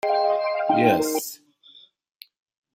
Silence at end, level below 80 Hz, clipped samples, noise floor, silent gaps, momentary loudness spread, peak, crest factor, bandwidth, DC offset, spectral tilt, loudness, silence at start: 1.4 s; -68 dBFS; under 0.1%; -53 dBFS; none; 14 LU; -4 dBFS; 20 dB; 16.5 kHz; under 0.1%; -4.5 dB/octave; -22 LUFS; 0.05 s